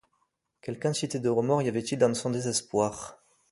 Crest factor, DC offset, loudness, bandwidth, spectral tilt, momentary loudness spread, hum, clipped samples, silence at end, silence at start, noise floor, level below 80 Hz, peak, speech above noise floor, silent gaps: 18 dB; under 0.1%; -28 LUFS; 11.5 kHz; -5 dB/octave; 15 LU; none; under 0.1%; 0.35 s; 0.65 s; -75 dBFS; -64 dBFS; -10 dBFS; 47 dB; none